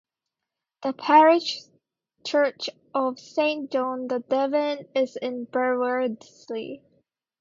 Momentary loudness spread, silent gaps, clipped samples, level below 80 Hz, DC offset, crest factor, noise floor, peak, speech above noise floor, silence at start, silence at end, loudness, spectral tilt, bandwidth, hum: 16 LU; none; under 0.1%; -78 dBFS; under 0.1%; 20 dB; -86 dBFS; -4 dBFS; 62 dB; 0.8 s; 0.65 s; -24 LUFS; -4 dB/octave; 7.6 kHz; none